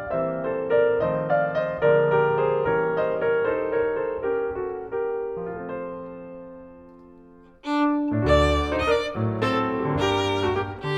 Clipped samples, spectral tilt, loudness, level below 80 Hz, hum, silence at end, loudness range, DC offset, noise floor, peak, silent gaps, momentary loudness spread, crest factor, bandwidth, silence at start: under 0.1%; -6.5 dB/octave; -24 LUFS; -40 dBFS; none; 0 s; 8 LU; under 0.1%; -49 dBFS; -8 dBFS; none; 13 LU; 16 dB; 10.5 kHz; 0 s